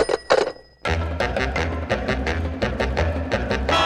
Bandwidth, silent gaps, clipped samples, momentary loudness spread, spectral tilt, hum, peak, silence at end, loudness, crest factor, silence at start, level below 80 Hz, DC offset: 11.5 kHz; none; under 0.1%; 5 LU; -5.5 dB/octave; none; -4 dBFS; 0 s; -23 LUFS; 18 dB; 0 s; -30 dBFS; under 0.1%